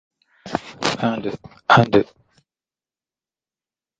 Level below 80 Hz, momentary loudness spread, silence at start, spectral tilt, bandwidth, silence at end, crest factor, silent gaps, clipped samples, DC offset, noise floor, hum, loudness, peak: -54 dBFS; 16 LU; 0.45 s; -5.5 dB/octave; 9.2 kHz; 1.95 s; 22 dB; none; under 0.1%; under 0.1%; under -90 dBFS; none; -20 LUFS; 0 dBFS